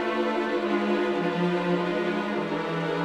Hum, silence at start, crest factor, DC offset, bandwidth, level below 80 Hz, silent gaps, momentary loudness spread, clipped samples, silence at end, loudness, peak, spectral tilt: none; 0 s; 12 dB; under 0.1%; 9.8 kHz; -62 dBFS; none; 3 LU; under 0.1%; 0 s; -26 LUFS; -14 dBFS; -7 dB/octave